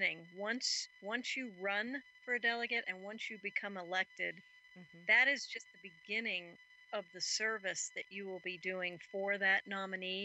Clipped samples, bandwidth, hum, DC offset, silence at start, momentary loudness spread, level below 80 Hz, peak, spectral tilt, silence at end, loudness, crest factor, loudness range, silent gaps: under 0.1%; 8.8 kHz; none; under 0.1%; 0 s; 13 LU; under -90 dBFS; -18 dBFS; -1.5 dB/octave; 0 s; -37 LUFS; 22 dB; 4 LU; none